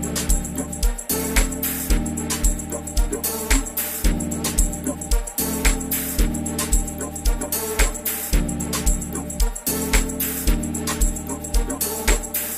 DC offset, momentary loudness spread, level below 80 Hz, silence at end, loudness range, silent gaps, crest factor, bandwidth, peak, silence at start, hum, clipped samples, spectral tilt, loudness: under 0.1%; 5 LU; -24 dBFS; 0 s; 1 LU; none; 20 dB; 16 kHz; -2 dBFS; 0 s; none; under 0.1%; -3.5 dB/octave; -23 LUFS